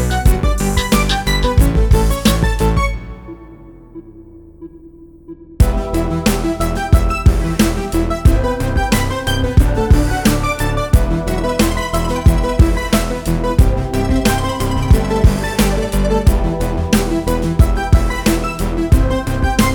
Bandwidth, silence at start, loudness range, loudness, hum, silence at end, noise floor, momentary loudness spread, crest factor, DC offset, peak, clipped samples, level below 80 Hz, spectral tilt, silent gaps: over 20 kHz; 0 s; 5 LU; -16 LUFS; none; 0 s; -39 dBFS; 5 LU; 14 dB; under 0.1%; 0 dBFS; under 0.1%; -18 dBFS; -5.5 dB/octave; none